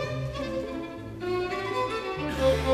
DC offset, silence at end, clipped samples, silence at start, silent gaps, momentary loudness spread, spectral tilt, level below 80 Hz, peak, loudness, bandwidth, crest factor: under 0.1%; 0 s; under 0.1%; 0 s; none; 10 LU; -6 dB/octave; -42 dBFS; -12 dBFS; -30 LUFS; 14 kHz; 16 dB